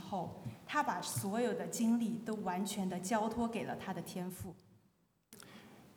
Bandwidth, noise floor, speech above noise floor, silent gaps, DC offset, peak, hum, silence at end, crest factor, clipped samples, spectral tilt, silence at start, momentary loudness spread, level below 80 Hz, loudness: over 20 kHz; -74 dBFS; 37 dB; none; under 0.1%; -22 dBFS; none; 0.05 s; 16 dB; under 0.1%; -5 dB/octave; 0 s; 17 LU; -70 dBFS; -38 LUFS